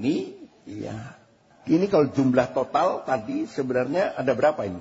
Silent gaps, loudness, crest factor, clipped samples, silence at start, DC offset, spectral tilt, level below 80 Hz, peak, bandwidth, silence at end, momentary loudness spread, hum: none; -24 LUFS; 18 dB; under 0.1%; 0 s; under 0.1%; -7 dB/octave; -60 dBFS; -6 dBFS; 8 kHz; 0 s; 17 LU; none